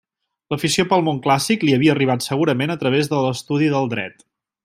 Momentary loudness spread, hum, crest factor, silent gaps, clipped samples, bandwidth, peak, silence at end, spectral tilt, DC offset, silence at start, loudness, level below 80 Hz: 8 LU; none; 16 dB; none; under 0.1%; 15.5 kHz; -2 dBFS; 0.55 s; -5 dB/octave; under 0.1%; 0.5 s; -19 LUFS; -58 dBFS